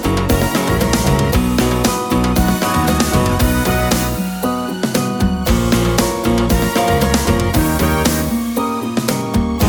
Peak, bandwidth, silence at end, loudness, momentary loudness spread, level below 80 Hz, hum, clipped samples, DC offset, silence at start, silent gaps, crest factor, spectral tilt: 0 dBFS; over 20 kHz; 0 s; -16 LUFS; 4 LU; -24 dBFS; none; under 0.1%; under 0.1%; 0 s; none; 14 dB; -5 dB/octave